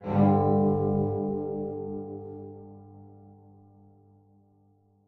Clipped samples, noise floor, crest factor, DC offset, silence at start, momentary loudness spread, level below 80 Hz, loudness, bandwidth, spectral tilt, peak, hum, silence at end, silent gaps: under 0.1%; -64 dBFS; 18 dB; under 0.1%; 0 s; 23 LU; -60 dBFS; -27 LUFS; 4.1 kHz; -12.5 dB/octave; -10 dBFS; 50 Hz at -50 dBFS; 1.75 s; none